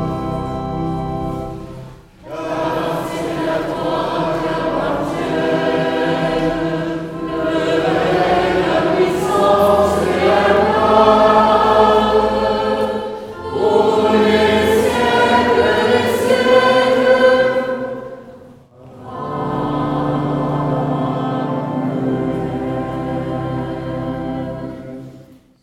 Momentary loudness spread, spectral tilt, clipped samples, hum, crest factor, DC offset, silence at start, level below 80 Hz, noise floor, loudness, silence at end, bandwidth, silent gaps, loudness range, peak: 13 LU; -6 dB/octave; under 0.1%; none; 16 dB; under 0.1%; 0 s; -40 dBFS; -42 dBFS; -16 LUFS; 0.4 s; 16.5 kHz; none; 9 LU; 0 dBFS